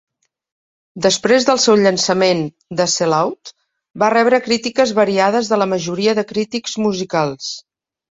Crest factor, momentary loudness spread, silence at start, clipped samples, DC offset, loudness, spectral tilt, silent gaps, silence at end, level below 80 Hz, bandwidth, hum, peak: 16 dB; 9 LU; 0.95 s; under 0.1%; under 0.1%; -16 LUFS; -3.5 dB/octave; 3.90-3.94 s; 0.5 s; -60 dBFS; 8.4 kHz; none; 0 dBFS